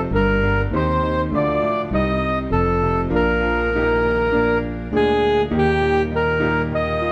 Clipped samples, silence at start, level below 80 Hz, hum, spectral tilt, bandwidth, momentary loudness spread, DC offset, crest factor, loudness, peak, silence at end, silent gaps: under 0.1%; 0 s; -30 dBFS; none; -8.5 dB/octave; 8.2 kHz; 3 LU; under 0.1%; 12 dB; -19 LUFS; -6 dBFS; 0 s; none